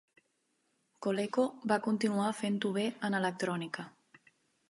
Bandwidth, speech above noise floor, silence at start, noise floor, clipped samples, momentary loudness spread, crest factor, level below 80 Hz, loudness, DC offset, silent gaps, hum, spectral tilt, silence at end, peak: 11.5 kHz; 45 dB; 1 s; -78 dBFS; under 0.1%; 8 LU; 20 dB; -82 dBFS; -33 LUFS; under 0.1%; none; none; -5.5 dB/octave; 0.8 s; -14 dBFS